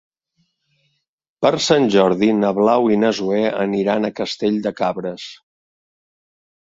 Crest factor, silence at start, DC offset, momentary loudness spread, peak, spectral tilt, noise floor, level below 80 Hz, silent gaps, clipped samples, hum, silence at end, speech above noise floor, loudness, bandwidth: 18 dB; 1.4 s; under 0.1%; 8 LU; 0 dBFS; -5.5 dB/octave; -68 dBFS; -60 dBFS; none; under 0.1%; none; 1.3 s; 51 dB; -18 LUFS; 7.8 kHz